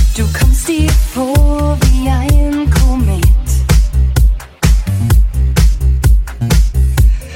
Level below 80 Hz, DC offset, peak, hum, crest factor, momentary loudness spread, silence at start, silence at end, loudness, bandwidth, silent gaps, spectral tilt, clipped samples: -10 dBFS; under 0.1%; 0 dBFS; none; 10 dB; 2 LU; 0 s; 0 s; -13 LUFS; 16.5 kHz; none; -6 dB/octave; under 0.1%